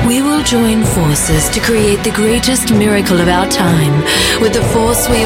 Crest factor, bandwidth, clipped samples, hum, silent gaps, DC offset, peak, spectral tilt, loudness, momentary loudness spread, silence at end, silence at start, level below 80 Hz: 12 dB; 17 kHz; under 0.1%; none; none; under 0.1%; 0 dBFS; -4 dB/octave; -11 LUFS; 1 LU; 0 s; 0 s; -26 dBFS